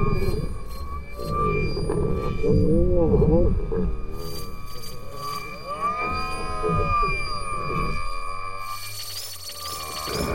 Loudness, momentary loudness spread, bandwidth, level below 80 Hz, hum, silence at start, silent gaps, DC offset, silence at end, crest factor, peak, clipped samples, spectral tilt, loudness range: -26 LUFS; 14 LU; 16 kHz; -30 dBFS; none; 0 s; none; 1%; 0 s; 16 dB; -8 dBFS; under 0.1%; -6 dB/octave; 6 LU